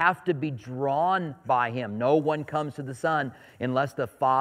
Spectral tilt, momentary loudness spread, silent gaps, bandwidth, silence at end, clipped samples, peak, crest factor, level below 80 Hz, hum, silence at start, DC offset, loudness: -7 dB/octave; 7 LU; none; 15.5 kHz; 0 s; under 0.1%; -8 dBFS; 18 dB; -70 dBFS; none; 0 s; under 0.1%; -27 LUFS